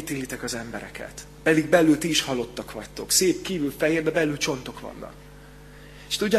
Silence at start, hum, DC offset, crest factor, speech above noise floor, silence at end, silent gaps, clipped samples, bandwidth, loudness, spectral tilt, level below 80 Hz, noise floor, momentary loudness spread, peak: 0 s; none; under 0.1%; 22 dB; 21 dB; 0 s; none; under 0.1%; 13.5 kHz; -23 LUFS; -3.5 dB/octave; -50 dBFS; -45 dBFS; 19 LU; -4 dBFS